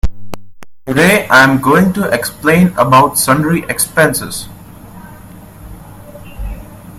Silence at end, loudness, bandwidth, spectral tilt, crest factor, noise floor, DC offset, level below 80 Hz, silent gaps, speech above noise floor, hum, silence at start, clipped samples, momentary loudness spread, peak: 0 s; -10 LUFS; 16.5 kHz; -4.5 dB/octave; 14 dB; -34 dBFS; under 0.1%; -30 dBFS; none; 24 dB; none; 0.05 s; 0.3%; 23 LU; 0 dBFS